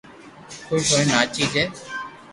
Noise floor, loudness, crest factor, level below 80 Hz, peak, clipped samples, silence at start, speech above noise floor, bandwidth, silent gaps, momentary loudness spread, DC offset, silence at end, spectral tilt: -43 dBFS; -20 LUFS; 22 dB; -54 dBFS; -2 dBFS; under 0.1%; 0.05 s; 22 dB; 11.5 kHz; none; 17 LU; under 0.1%; 0 s; -3 dB/octave